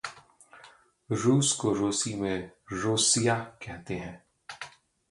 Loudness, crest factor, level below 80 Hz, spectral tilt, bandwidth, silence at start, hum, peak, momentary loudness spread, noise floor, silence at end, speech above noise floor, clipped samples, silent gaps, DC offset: -27 LUFS; 18 dB; -60 dBFS; -3.5 dB/octave; 11.5 kHz; 0.05 s; none; -12 dBFS; 20 LU; -56 dBFS; 0.4 s; 28 dB; under 0.1%; none; under 0.1%